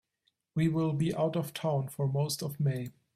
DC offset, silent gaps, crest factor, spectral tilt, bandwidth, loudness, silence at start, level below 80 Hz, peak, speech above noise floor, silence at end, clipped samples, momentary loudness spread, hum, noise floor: under 0.1%; none; 14 dB; -6.5 dB/octave; 15 kHz; -32 LUFS; 0.55 s; -64 dBFS; -18 dBFS; 48 dB; 0.25 s; under 0.1%; 4 LU; none; -78 dBFS